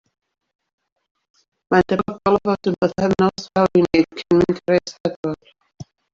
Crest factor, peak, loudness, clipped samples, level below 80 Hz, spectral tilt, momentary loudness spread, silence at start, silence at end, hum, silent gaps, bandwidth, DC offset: 18 dB; -2 dBFS; -19 LUFS; under 0.1%; -52 dBFS; -7 dB/octave; 9 LU; 1.7 s; 0.3 s; none; 5.00-5.04 s, 5.16-5.23 s; 7.6 kHz; under 0.1%